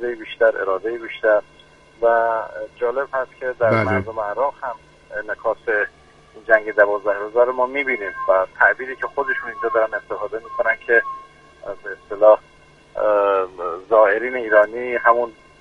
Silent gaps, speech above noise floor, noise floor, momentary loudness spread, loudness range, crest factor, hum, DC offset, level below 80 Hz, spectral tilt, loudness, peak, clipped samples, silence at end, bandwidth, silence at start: none; 30 dB; -50 dBFS; 15 LU; 4 LU; 20 dB; none; under 0.1%; -56 dBFS; -7 dB/octave; -19 LUFS; 0 dBFS; under 0.1%; 0.3 s; 7.4 kHz; 0 s